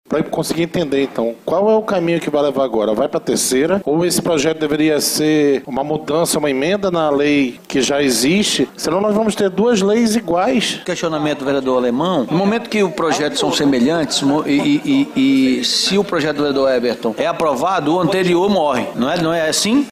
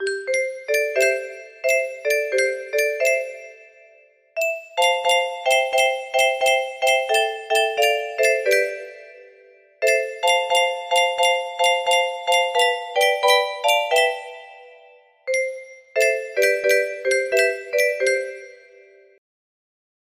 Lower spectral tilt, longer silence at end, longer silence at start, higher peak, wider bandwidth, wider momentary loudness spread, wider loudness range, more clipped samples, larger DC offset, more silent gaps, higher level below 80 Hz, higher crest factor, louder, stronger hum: first, -4 dB/octave vs 1 dB/octave; second, 0 s vs 1.6 s; about the same, 0.1 s vs 0 s; about the same, -2 dBFS vs -4 dBFS; about the same, 15.5 kHz vs 15.5 kHz; second, 5 LU vs 9 LU; about the same, 2 LU vs 4 LU; neither; neither; neither; first, -50 dBFS vs -72 dBFS; about the same, 14 dB vs 18 dB; first, -16 LUFS vs -20 LUFS; neither